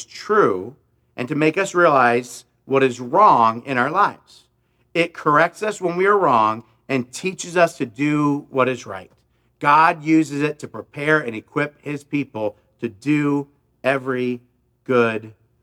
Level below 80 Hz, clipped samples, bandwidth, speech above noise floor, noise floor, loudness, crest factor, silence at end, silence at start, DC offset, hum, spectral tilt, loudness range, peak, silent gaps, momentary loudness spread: -68 dBFS; under 0.1%; 14 kHz; 45 dB; -64 dBFS; -19 LUFS; 18 dB; 0.3 s; 0 s; under 0.1%; none; -5.5 dB/octave; 6 LU; -2 dBFS; none; 16 LU